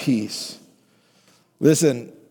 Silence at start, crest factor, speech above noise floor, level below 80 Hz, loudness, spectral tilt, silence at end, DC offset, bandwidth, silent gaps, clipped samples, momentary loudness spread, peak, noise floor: 0 s; 18 dB; 39 dB; -72 dBFS; -21 LUFS; -5 dB/octave; 0.2 s; under 0.1%; 19 kHz; none; under 0.1%; 16 LU; -4 dBFS; -59 dBFS